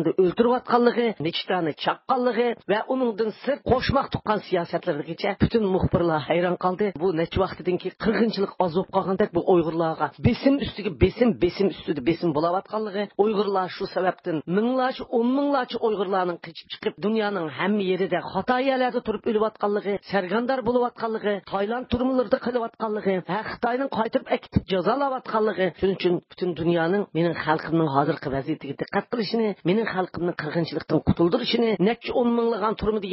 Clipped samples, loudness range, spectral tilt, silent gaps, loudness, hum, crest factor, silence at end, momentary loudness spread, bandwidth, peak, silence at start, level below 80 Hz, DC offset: under 0.1%; 2 LU; -11 dB/octave; none; -24 LUFS; none; 18 dB; 0 s; 6 LU; 5.8 kHz; -6 dBFS; 0 s; -46 dBFS; under 0.1%